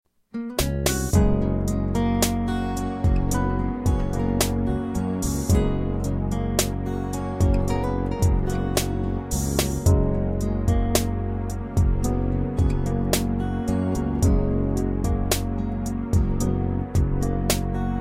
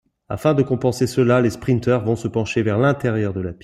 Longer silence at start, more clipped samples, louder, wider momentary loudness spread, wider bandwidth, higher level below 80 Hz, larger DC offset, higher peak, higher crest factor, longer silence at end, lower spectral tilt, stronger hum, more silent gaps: about the same, 0.35 s vs 0.3 s; neither; second, -24 LUFS vs -19 LUFS; about the same, 5 LU vs 5 LU; first, 16.5 kHz vs 14.5 kHz; first, -28 dBFS vs -50 dBFS; neither; about the same, -4 dBFS vs -4 dBFS; about the same, 18 dB vs 16 dB; about the same, 0 s vs 0.1 s; about the same, -6 dB/octave vs -7 dB/octave; neither; neither